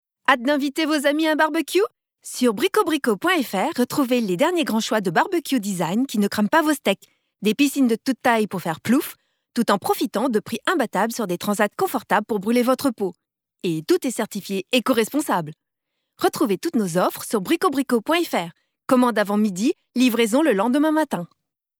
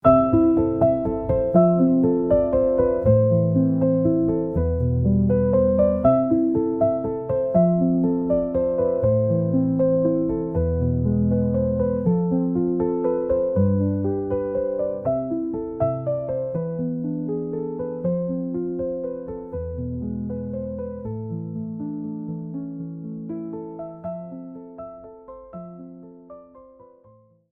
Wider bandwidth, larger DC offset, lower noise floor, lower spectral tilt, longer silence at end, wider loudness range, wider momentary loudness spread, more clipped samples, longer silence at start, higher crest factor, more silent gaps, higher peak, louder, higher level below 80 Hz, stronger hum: first, over 20 kHz vs 3.5 kHz; neither; first, -79 dBFS vs -54 dBFS; second, -4.5 dB/octave vs -14 dB/octave; second, 0.55 s vs 0.9 s; second, 2 LU vs 14 LU; second, 8 LU vs 15 LU; neither; first, 0.3 s vs 0.05 s; about the same, 18 dB vs 18 dB; neither; about the same, -4 dBFS vs -4 dBFS; about the same, -21 LUFS vs -22 LUFS; second, -72 dBFS vs -42 dBFS; neither